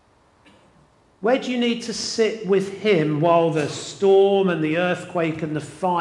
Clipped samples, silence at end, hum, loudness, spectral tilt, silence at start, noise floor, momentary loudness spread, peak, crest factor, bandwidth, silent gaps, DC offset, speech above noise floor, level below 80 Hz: under 0.1%; 0 s; none; -21 LUFS; -5.5 dB/octave; 1.2 s; -56 dBFS; 9 LU; -4 dBFS; 16 dB; 11 kHz; none; under 0.1%; 36 dB; -64 dBFS